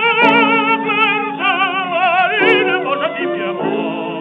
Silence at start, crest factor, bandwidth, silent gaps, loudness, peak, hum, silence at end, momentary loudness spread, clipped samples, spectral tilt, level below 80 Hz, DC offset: 0 s; 14 dB; 7.6 kHz; none; -14 LUFS; 0 dBFS; none; 0 s; 9 LU; under 0.1%; -6 dB/octave; -74 dBFS; under 0.1%